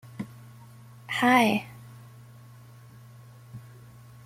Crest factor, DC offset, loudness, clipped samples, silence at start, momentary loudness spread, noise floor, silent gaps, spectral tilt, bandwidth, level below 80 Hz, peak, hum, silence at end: 22 dB; under 0.1%; -23 LUFS; under 0.1%; 0.2 s; 29 LU; -49 dBFS; none; -5 dB/octave; 16 kHz; -68 dBFS; -8 dBFS; none; 0.65 s